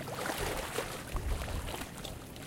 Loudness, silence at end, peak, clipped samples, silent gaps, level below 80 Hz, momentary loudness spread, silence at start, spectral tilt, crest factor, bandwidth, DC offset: -38 LUFS; 0 s; -20 dBFS; under 0.1%; none; -42 dBFS; 7 LU; 0 s; -4 dB/octave; 18 dB; 17 kHz; under 0.1%